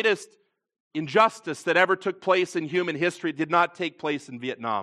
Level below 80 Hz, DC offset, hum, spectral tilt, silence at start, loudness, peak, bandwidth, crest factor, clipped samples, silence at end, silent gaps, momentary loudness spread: -80 dBFS; under 0.1%; none; -4.5 dB/octave; 0 s; -25 LUFS; -4 dBFS; 12.5 kHz; 20 dB; under 0.1%; 0 s; 0.80-0.91 s; 10 LU